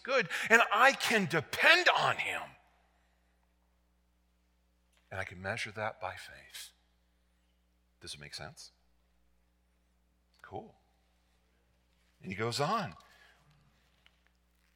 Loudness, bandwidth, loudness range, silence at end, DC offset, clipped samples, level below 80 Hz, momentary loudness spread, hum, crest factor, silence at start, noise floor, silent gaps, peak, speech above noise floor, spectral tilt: -29 LUFS; 17 kHz; 23 LU; 1.8 s; under 0.1%; under 0.1%; -72 dBFS; 24 LU; none; 28 dB; 0.05 s; -73 dBFS; none; -8 dBFS; 41 dB; -3 dB/octave